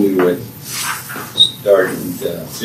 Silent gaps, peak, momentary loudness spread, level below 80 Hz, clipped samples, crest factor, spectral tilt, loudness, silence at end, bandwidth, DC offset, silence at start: none; 0 dBFS; 12 LU; -56 dBFS; under 0.1%; 16 dB; -3.5 dB/octave; -16 LUFS; 0 s; 16 kHz; under 0.1%; 0 s